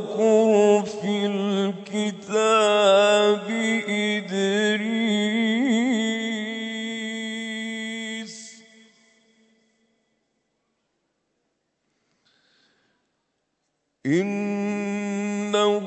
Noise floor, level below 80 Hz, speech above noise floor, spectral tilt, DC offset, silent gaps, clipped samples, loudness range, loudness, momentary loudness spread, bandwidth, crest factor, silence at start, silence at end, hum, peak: -75 dBFS; -78 dBFS; 55 dB; -4.5 dB/octave; under 0.1%; none; under 0.1%; 14 LU; -22 LUFS; 12 LU; 8.6 kHz; 18 dB; 0 s; 0 s; none; -6 dBFS